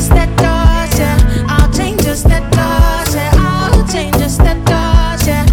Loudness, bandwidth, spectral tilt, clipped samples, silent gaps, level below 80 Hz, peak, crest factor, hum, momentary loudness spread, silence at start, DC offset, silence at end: -12 LUFS; 17.5 kHz; -5.5 dB/octave; under 0.1%; none; -12 dBFS; 0 dBFS; 10 dB; none; 3 LU; 0 s; under 0.1%; 0 s